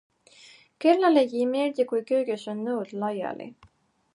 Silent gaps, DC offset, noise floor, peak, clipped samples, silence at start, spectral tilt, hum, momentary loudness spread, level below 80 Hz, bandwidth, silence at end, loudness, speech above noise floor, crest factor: none; under 0.1%; -54 dBFS; -8 dBFS; under 0.1%; 0.8 s; -6 dB/octave; none; 12 LU; -74 dBFS; 11 kHz; 0.6 s; -25 LUFS; 29 dB; 18 dB